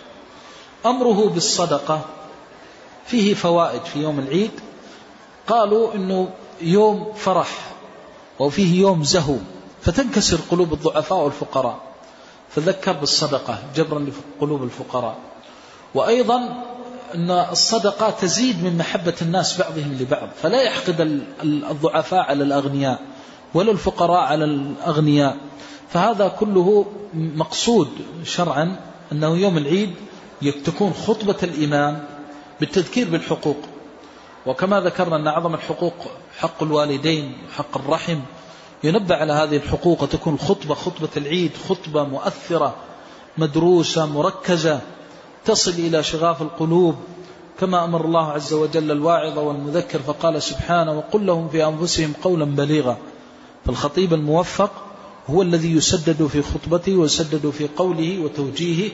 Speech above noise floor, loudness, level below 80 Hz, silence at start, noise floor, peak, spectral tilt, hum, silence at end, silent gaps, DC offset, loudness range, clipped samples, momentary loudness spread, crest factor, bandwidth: 25 dB; -20 LUFS; -46 dBFS; 0 s; -44 dBFS; -4 dBFS; -5 dB/octave; none; 0 s; none; under 0.1%; 3 LU; under 0.1%; 12 LU; 16 dB; 8 kHz